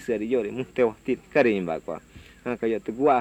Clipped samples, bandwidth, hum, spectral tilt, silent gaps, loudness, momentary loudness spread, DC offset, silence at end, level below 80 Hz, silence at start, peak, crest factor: under 0.1%; 9.8 kHz; none; -7 dB/octave; none; -26 LUFS; 12 LU; under 0.1%; 0 s; -56 dBFS; 0 s; -8 dBFS; 18 dB